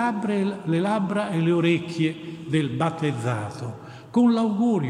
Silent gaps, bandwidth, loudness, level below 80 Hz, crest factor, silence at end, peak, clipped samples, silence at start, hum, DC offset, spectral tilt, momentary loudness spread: none; 11 kHz; -24 LUFS; -66 dBFS; 16 dB; 0 s; -8 dBFS; under 0.1%; 0 s; none; under 0.1%; -7 dB/octave; 11 LU